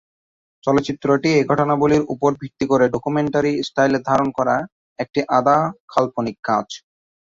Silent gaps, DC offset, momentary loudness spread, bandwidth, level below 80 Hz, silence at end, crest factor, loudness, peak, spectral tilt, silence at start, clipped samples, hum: 4.72-4.96 s, 5.80-5.88 s, 6.39-6.43 s; under 0.1%; 8 LU; 7.6 kHz; -52 dBFS; 0.45 s; 18 dB; -19 LUFS; -2 dBFS; -6.5 dB/octave; 0.65 s; under 0.1%; none